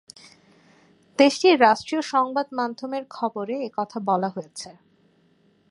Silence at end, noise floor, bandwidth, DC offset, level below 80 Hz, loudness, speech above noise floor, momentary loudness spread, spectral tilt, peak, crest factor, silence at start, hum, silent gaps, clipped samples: 1 s; -61 dBFS; 11.5 kHz; under 0.1%; -74 dBFS; -22 LUFS; 39 dB; 18 LU; -4 dB/octave; -2 dBFS; 22 dB; 1.2 s; none; none; under 0.1%